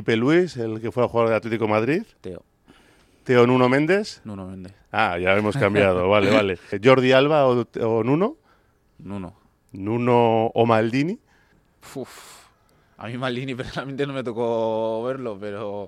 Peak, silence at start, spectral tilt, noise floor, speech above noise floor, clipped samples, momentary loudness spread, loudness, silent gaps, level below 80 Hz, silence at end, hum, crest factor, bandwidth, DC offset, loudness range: -2 dBFS; 0 s; -6.5 dB/octave; -60 dBFS; 39 dB; under 0.1%; 19 LU; -21 LUFS; none; -58 dBFS; 0 s; none; 20 dB; 14 kHz; under 0.1%; 9 LU